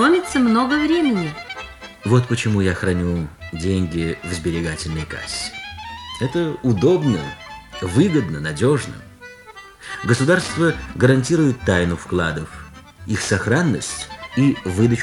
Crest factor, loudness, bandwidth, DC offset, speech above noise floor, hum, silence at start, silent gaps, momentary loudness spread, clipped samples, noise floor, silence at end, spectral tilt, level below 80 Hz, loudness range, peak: 18 dB; -20 LUFS; 13 kHz; under 0.1%; 23 dB; none; 0 s; none; 16 LU; under 0.1%; -41 dBFS; 0 s; -6 dB/octave; -42 dBFS; 4 LU; -2 dBFS